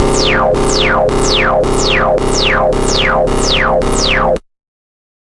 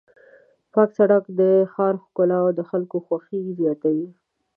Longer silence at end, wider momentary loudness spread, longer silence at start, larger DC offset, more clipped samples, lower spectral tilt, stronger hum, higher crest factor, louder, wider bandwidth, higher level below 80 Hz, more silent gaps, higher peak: first, 0.9 s vs 0.45 s; second, 2 LU vs 9 LU; second, 0 s vs 0.75 s; neither; neither; second, -3.5 dB/octave vs -11.5 dB/octave; neither; second, 12 dB vs 18 dB; first, -12 LUFS vs -21 LUFS; first, 11.5 kHz vs 3.2 kHz; first, -20 dBFS vs -78 dBFS; neither; first, 0 dBFS vs -4 dBFS